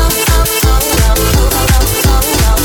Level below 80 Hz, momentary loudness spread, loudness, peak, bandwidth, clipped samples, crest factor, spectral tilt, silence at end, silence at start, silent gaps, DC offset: -12 dBFS; 0 LU; -10 LUFS; 0 dBFS; 19 kHz; under 0.1%; 10 dB; -3.5 dB/octave; 0 s; 0 s; none; under 0.1%